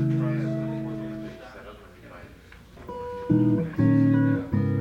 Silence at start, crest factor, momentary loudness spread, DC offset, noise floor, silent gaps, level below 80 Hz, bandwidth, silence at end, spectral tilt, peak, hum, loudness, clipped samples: 0 s; 16 dB; 24 LU; under 0.1%; -48 dBFS; none; -52 dBFS; 7 kHz; 0 s; -10 dB/octave; -10 dBFS; none; -25 LUFS; under 0.1%